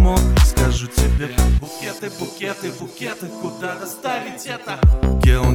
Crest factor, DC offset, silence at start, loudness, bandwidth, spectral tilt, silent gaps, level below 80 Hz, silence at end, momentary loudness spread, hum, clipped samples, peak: 14 dB; under 0.1%; 0 s; -20 LUFS; 18 kHz; -5.5 dB/octave; none; -20 dBFS; 0 s; 13 LU; none; under 0.1%; -4 dBFS